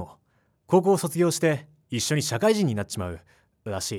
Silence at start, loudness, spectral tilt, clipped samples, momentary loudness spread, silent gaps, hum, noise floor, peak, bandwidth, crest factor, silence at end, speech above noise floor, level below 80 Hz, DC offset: 0 s; -24 LUFS; -5 dB/octave; under 0.1%; 14 LU; none; none; -68 dBFS; -8 dBFS; 19.5 kHz; 18 dB; 0 s; 44 dB; -58 dBFS; under 0.1%